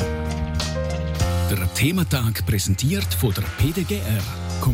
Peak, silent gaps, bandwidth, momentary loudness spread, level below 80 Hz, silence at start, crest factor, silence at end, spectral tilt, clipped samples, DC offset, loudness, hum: -8 dBFS; none; 16.5 kHz; 5 LU; -32 dBFS; 0 s; 12 dB; 0 s; -5 dB/octave; under 0.1%; under 0.1%; -23 LUFS; none